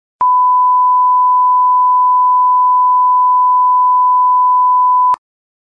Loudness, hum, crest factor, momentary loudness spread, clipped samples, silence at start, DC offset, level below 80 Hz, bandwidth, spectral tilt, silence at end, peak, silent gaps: -10 LUFS; none; 4 dB; 1 LU; under 0.1%; 0.2 s; under 0.1%; -68 dBFS; 1.9 kHz; -3.5 dB/octave; 0.45 s; -6 dBFS; none